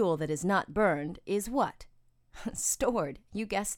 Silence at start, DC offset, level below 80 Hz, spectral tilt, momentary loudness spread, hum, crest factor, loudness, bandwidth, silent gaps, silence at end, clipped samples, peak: 0 s; under 0.1%; -54 dBFS; -4 dB/octave; 9 LU; none; 18 dB; -31 LUFS; 18.5 kHz; none; 0 s; under 0.1%; -14 dBFS